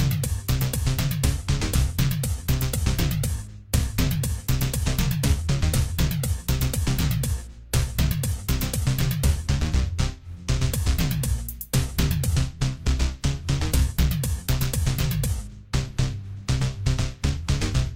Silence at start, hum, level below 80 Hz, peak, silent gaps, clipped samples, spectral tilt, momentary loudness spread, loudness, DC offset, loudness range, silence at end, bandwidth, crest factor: 0 s; none; -28 dBFS; -6 dBFS; none; under 0.1%; -5 dB/octave; 5 LU; -25 LUFS; under 0.1%; 1 LU; 0 s; 17 kHz; 16 dB